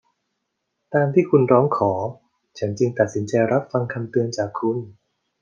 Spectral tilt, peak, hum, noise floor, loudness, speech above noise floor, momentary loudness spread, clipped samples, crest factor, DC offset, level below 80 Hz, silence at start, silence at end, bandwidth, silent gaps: -7.5 dB/octave; -2 dBFS; none; -77 dBFS; -21 LUFS; 57 dB; 12 LU; under 0.1%; 20 dB; under 0.1%; -68 dBFS; 0.9 s; 0.5 s; 7.4 kHz; none